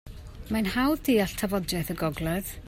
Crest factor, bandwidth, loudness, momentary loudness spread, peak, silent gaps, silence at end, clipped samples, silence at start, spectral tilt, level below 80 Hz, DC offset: 14 dB; 16 kHz; -27 LUFS; 7 LU; -14 dBFS; none; 0 s; under 0.1%; 0.05 s; -5 dB/octave; -44 dBFS; under 0.1%